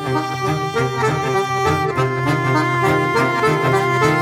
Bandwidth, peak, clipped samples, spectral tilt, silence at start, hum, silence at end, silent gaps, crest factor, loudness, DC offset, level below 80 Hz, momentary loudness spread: 16 kHz; -2 dBFS; under 0.1%; -6 dB/octave; 0 s; none; 0 s; none; 16 dB; -18 LUFS; under 0.1%; -52 dBFS; 4 LU